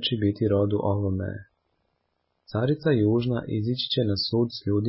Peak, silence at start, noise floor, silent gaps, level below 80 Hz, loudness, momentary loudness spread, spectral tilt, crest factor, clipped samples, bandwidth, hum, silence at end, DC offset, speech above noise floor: -12 dBFS; 0 s; -75 dBFS; none; -48 dBFS; -25 LUFS; 7 LU; -11 dB/octave; 14 dB; under 0.1%; 5.8 kHz; none; 0 s; under 0.1%; 51 dB